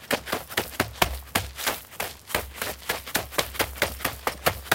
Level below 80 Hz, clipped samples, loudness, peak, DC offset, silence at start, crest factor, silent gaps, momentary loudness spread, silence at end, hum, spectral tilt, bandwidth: -44 dBFS; under 0.1%; -28 LUFS; 0 dBFS; under 0.1%; 0 s; 28 dB; none; 6 LU; 0 s; none; -2.5 dB/octave; 16.5 kHz